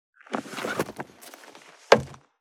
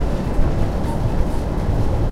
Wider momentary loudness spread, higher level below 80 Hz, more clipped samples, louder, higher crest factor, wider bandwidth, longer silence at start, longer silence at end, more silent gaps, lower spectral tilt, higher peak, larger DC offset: first, 24 LU vs 2 LU; second, -60 dBFS vs -20 dBFS; neither; second, -26 LUFS vs -22 LUFS; first, 28 dB vs 12 dB; first, 18 kHz vs 12 kHz; first, 0.3 s vs 0 s; first, 0.25 s vs 0 s; neither; second, -4 dB/octave vs -8 dB/octave; first, 0 dBFS vs -4 dBFS; neither